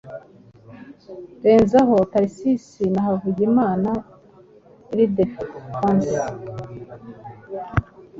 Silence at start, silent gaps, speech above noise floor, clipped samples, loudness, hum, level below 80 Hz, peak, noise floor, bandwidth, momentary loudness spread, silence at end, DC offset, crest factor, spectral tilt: 0.05 s; none; 30 dB; under 0.1%; -20 LUFS; none; -46 dBFS; -2 dBFS; -49 dBFS; 7.8 kHz; 24 LU; 0 s; under 0.1%; 20 dB; -8 dB/octave